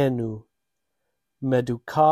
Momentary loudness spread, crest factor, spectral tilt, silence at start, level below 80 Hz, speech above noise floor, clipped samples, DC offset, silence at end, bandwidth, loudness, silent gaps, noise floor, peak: 10 LU; 18 dB; -8 dB/octave; 0 s; -58 dBFS; 59 dB; under 0.1%; under 0.1%; 0 s; 14 kHz; -25 LUFS; none; -82 dBFS; -6 dBFS